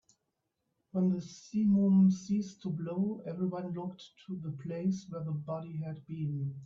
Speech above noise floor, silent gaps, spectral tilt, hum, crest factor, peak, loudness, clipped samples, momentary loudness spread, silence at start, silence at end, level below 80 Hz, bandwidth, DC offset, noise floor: 51 dB; none; -8.5 dB/octave; none; 14 dB; -18 dBFS; -33 LUFS; under 0.1%; 15 LU; 0.95 s; 0 s; -74 dBFS; 7.4 kHz; under 0.1%; -84 dBFS